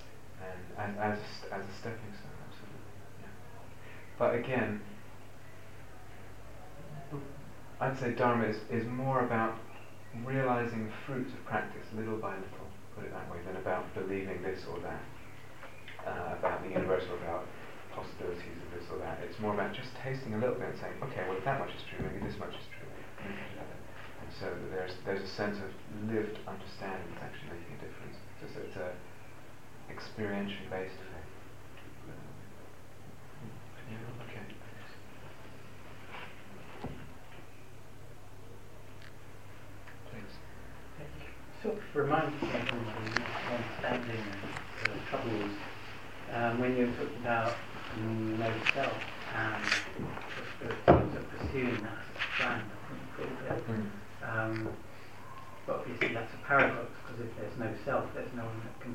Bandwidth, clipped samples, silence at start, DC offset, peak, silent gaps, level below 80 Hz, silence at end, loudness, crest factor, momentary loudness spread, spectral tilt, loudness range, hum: 16 kHz; under 0.1%; 0 s; 0.6%; -8 dBFS; none; -58 dBFS; 0 s; -36 LUFS; 30 dB; 20 LU; -6 dB/octave; 16 LU; none